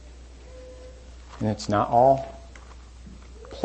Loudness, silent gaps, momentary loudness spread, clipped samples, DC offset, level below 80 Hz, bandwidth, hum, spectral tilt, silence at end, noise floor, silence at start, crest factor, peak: -23 LUFS; none; 27 LU; under 0.1%; under 0.1%; -44 dBFS; 8.6 kHz; none; -6.5 dB/octave; 0 s; -44 dBFS; 0.05 s; 20 dB; -6 dBFS